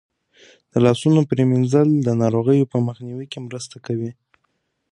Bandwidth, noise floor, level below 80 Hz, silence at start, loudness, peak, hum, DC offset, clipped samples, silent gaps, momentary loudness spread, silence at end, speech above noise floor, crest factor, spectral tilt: 11 kHz; -71 dBFS; -60 dBFS; 0.75 s; -18 LUFS; -2 dBFS; none; under 0.1%; under 0.1%; none; 15 LU; 0.8 s; 53 dB; 18 dB; -7.5 dB/octave